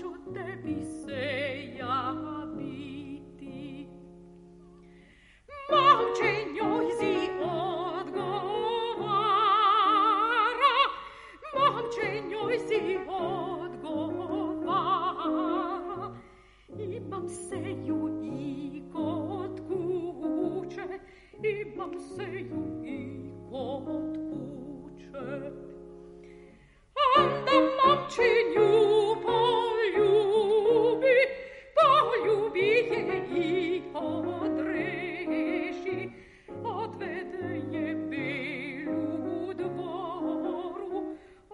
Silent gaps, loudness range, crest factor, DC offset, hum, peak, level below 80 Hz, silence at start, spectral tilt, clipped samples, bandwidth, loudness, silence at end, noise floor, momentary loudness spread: none; 13 LU; 22 dB; under 0.1%; none; -8 dBFS; -62 dBFS; 0 s; -5.5 dB/octave; under 0.1%; 11 kHz; -28 LUFS; 0 s; -57 dBFS; 18 LU